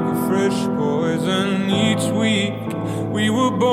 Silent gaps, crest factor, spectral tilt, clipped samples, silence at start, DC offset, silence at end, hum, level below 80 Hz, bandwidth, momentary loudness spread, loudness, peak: none; 14 dB; -5.5 dB/octave; under 0.1%; 0 s; under 0.1%; 0 s; none; -56 dBFS; 16 kHz; 6 LU; -20 LUFS; -6 dBFS